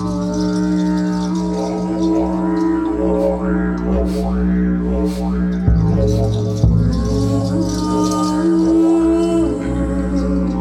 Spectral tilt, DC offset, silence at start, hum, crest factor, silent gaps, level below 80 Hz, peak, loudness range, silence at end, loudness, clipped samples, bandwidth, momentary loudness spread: -7.5 dB/octave; under 0.1%; 0 s; none; 14 dB; none; -26 dBFS; -2 dBFS; 2 LU; 0 s; -17 LUFS; under 0.1%; 12 kHz; 5 LU